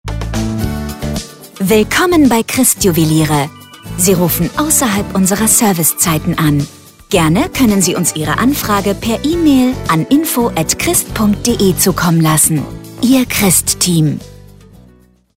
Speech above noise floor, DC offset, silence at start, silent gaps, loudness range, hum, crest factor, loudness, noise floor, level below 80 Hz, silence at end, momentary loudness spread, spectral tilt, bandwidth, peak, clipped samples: 34 dB; 0.1%; 0.05 s; none; 1 LU; none; 12 dB; -12 LUFS; -46 dBFS; -32 dBFS; 1 s; 10 LU; -4 dB/octave; 16.5 kHz; 0 dBFS; under 0.1%